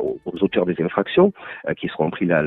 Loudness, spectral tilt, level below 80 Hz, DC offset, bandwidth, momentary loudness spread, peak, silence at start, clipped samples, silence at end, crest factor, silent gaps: -21 LUFS; -9.5 dB/octave; -54 dBFS; under 0.1%; 4.1 kHz; 9 LU; -2 dBFS; 0 s; under 0.1%; 0 s; 18 dB; none